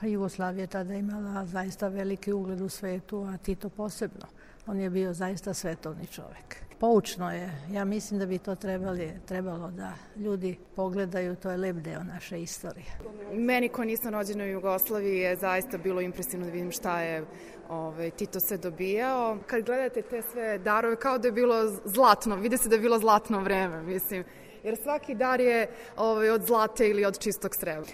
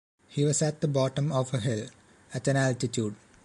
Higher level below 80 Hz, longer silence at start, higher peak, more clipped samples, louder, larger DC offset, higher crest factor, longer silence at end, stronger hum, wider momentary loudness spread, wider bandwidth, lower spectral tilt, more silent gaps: first, -54 dBFS vs -62 dBFS; second, 0 s vs 0.3 s; first, -6 dBFS vs -14 dBFS; neither; about the same, -29 LUFS vs -28 LUFS; neither; first, 24 dB vs 16 dB; second, 0 s vs 0.3 s; neither; first, 13 LU vs 10 LU; first, 16 kHz vs 11.5 kHz; about the same, -5 dB/octave vs -5.5 dB/octave; neither